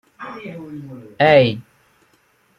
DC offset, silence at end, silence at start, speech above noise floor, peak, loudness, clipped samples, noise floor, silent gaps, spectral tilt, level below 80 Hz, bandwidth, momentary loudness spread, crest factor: under 0.1%; 1 s; 0.2 s; 42 dB; -2 dBFS; -15 LUFS; under 0.1%; -59 dBFS; none; -7.5 dB/octave; -56 dBFS; 7 kHz; 22 LU; 18 dB